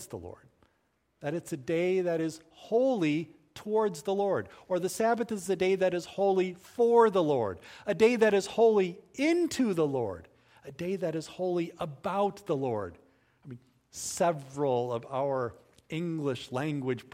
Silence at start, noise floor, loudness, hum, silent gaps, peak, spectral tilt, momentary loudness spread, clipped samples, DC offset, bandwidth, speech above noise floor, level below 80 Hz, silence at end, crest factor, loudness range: 0 s; -74 dBFS; -30 LUFS; none; none; -10 dBFS; -5.5 dB/octave; 14 LU; under 0.1%; under 0.1%; 16 kHz; 45 dB; -68 dBFS; 0.1 s; 20 dB; 7 LU